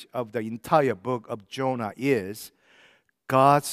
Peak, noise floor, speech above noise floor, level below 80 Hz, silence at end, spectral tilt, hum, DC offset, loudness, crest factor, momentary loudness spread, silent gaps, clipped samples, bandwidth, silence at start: -4 dBFS; -60 dBFS; 35 dB; -68 dBFS; 0 s; -5.5 dB/octave; none; under 0.1%; -25 LUFS; 20 dB; 16 LU; none; under 0.1%; 16 kHz; 0 s